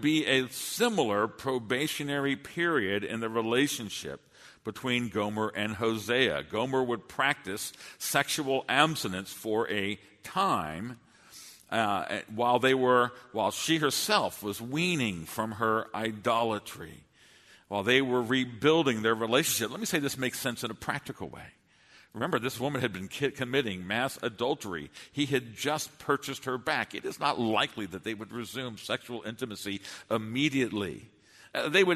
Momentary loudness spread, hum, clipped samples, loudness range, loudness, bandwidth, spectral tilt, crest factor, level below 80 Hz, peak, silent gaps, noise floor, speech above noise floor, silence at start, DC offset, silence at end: 12 LU; none; under 0.1%; 6 LU; -30 LUFS; 13.5 kHz; -4 dB/octave; 24 dB; -66 dBFS; -6 dBFS; none; -59 dBFS; 29 dB; 0 s; under 0.1%; 0 s